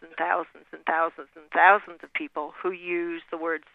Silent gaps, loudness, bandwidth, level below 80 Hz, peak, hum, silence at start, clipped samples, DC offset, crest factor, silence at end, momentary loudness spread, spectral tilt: none; -26 LUFS; 4.7 kHz; -74 dBFS; -2 dBFS; none; 0 s; under 0.1%; under 0.1%; 24 dB; 0.15 s; 15 LU; -6 dB/octave